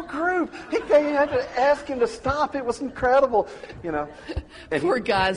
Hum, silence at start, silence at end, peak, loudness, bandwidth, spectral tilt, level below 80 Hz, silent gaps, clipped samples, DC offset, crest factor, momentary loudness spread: none; 0 s; 0 s; -8 dBFS; -23 LUFS; 10.5 kHz; -5.5 dB/octave; -46 dBFS; none; under 0.1%; under 0.1%; 14 dB; 13 LU